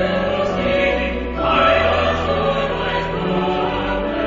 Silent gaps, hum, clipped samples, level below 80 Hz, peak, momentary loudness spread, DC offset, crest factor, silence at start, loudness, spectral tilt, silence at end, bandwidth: none; none; under 0.1%; -32 dBFS; -2 dBFS; 7 LU; under 0.1%; 16 dB; 0 s; -18 LUFS; -6.5 dB/octave; 0 s; 7.6 kHz